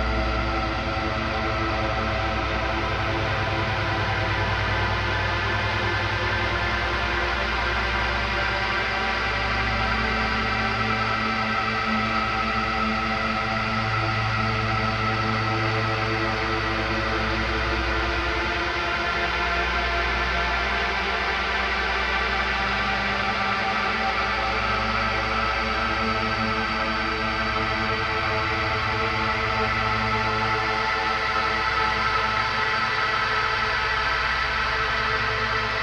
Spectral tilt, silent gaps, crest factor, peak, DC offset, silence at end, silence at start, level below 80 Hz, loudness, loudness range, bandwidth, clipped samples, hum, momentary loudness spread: -5 dB/octave; none; 14 dB; -10 dBFS; under 0.1%; 0 s; 0 s; -34 dBFS; -23 LUFS; 2 LU; 10.5 kHz; under 0.1%; none; 2 LU